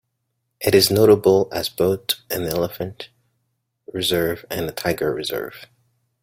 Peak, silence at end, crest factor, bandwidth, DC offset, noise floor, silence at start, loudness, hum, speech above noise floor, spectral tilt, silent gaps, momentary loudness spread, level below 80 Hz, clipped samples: 0 dBFS; 0.6 s; 20 dB; 16.5 kHz; under 0.1%; -75 dBFS; 0.6 s; -20 LUFS; none; 55 dB; -4.5 dB/octave; none; 17 LU; -52 dBFS; under 0.1%